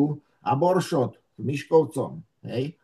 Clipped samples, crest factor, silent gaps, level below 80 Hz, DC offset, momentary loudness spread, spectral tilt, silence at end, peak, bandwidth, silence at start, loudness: under 0.1%; 18 dB; none; -70 dBFS; under 0.1%; 12 LU; -7 dB/octave; 0.1 s; -8 dBFS; 12.5 kHz; 0 s; -25 LUFS